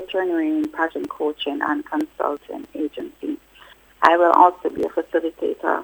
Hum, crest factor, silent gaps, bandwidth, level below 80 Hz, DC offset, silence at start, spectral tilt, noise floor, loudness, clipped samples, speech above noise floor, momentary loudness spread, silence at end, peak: none; 22 dB; none; over 20 kHz; -60 dBFS; under 0.1%; 0 s; -5 dB/octave; -49 dBFS; -21 LUFS; under 0.1%; 28 dB; 16 LU; 0 s; 0 dBFS